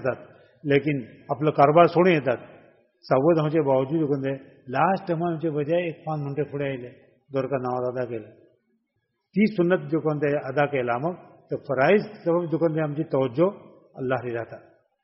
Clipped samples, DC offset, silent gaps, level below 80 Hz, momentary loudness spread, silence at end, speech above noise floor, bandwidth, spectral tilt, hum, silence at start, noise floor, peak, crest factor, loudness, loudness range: under 0.1%; under 0.1%; none; -66 dBFS; 13 LU; 0.45 s; 53 dB; 5.8 kHz; -6.5 dB/octave; none; 0 s; -76 dBFS; -4 dBFS; 22 dB; -24 LUFS; 7 LU